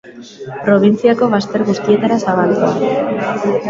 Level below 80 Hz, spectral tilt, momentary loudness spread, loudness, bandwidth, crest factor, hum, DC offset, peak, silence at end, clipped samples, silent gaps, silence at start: -54 dBFS; -7 dB/octave; 6 LU; -14 LUFS; 7.6 kHz; 14 dB; none; under 0.1%; 0 dBFS; 0 s; under 0.1%; none; 0.05 s